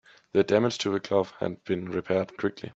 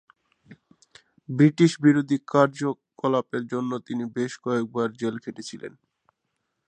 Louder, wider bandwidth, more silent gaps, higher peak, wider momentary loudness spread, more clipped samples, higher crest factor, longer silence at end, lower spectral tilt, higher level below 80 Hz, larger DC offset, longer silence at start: second, -27 LUFS vs -24 LUFS; second, 8 kHz vs 9.4 kHz; neither; second, -8 dBFS vs -4 dBFS; second, 8 LU vs 17 LU; neither; about the same, 20 dB vs 22 dB; second, 0.05 s vs 1 s; second, -5.5 dB/octave vs -7 dB/octave; first, -66 dBFS vs -72 dBFS; neither; second, 0.35 s vs 0.5 s